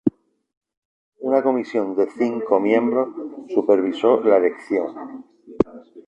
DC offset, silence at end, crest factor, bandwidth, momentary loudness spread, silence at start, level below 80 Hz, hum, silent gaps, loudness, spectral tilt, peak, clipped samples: under 0.1%; 0.1 s; 18 dB; 8.2 kHz; 13 LU; 0.05 s; -58 dBFS; none; 0.57-0.61 s, 0.77-1.12 s; -20 LUFS; -7.5 dB/octave; -4 dBFS; under 0.1%